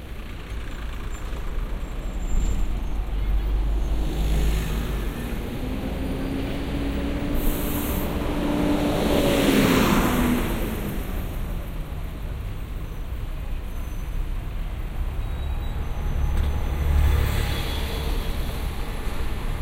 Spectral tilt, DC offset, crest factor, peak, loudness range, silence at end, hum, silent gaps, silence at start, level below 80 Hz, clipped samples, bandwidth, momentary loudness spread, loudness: -6 dB/octave; under 0.1%; 16 dB; -6 dBFS; 11 LU; 0 s; none; none; 0 s; -26 dBFS; under 0.1%; 16 kHz; 13 LU; -27 LUFS